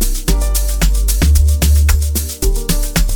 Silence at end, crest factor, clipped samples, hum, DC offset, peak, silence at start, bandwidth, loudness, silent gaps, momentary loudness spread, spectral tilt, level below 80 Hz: 0 s; 12 dB; under 0.1%; none; under 0.1%; 0 dBFS; 0 s; 19.5 kHz; -15 LUFS; none; 6 LU; -4.5 dB/octave; -12 dBFS